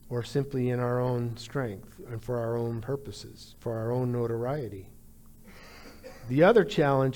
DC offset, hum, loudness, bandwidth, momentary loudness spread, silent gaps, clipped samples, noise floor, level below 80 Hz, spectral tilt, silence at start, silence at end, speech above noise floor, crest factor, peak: under 0.1%; none; -28 LUFS; 19 kHz; 23 LU; none; under 0.1%; -51 dBFS; -54 dBFS; -7.5 dB/octave; 0.05 s; 0 s; 23 dB; 20 dB; -10 dBFS